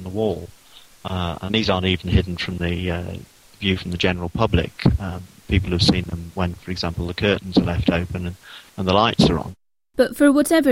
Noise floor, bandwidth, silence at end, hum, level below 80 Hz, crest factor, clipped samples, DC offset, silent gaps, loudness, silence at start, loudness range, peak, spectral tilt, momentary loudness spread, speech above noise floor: -47 dBFS; 16 kHz; 0 s; none; -34 dBFS; 18 dB; under 0.1%; under 0.1%; none; -21 LUFS; 0 s; 3 LU; -2 dBFS; -6 dB/octave; 15 LU; 27 dB